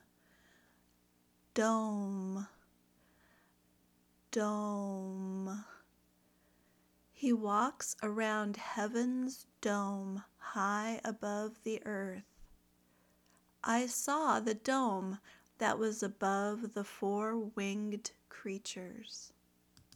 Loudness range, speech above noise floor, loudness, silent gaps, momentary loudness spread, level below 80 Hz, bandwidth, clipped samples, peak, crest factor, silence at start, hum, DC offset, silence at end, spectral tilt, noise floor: 6 LU; 36 dB; -37 LUFS; none; 12 LU; -76 dBFS; 18.5 kHz; under 0.1%; -18 dBFS; 22 dB; 1.55 s; 60 Hz at -65 dBFS; under 0.1%; 0.65 s; -4.5 dB/octave; -72 dBFS